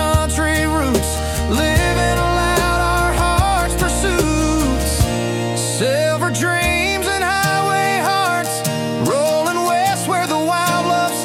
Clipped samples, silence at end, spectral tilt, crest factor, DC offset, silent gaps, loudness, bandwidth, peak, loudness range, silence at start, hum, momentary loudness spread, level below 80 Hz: under 0.1%; 0 s; -4 dB/octave; 14 dB; under 0.1%; none; -17 LUFS; 17.5 kHz; -2 dBFS; 1 LU; 0 s; none; 3 LU; -26 dBFS